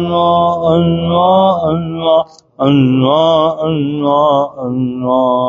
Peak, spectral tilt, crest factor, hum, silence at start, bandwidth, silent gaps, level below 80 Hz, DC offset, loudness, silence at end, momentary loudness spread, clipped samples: 0 dBFS; -6.5 dB/octave; 12 dB; none; 0 s; 7.2 kHz; none; -48 dBFS; under 0.1%; -12 LUFS; 0 s; 7 LU; under 0.1%